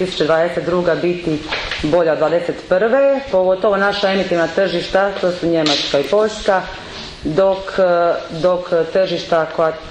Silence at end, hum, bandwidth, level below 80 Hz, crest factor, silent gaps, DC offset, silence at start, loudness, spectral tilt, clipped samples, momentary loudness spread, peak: 0 s; none; 9.8 kHz; -42 dBFS; 14 dB; none; under 0.1%; 0 s; -16 LUFS; -5 dB/octave; under 0.1%; 5 LU; -2 dBFS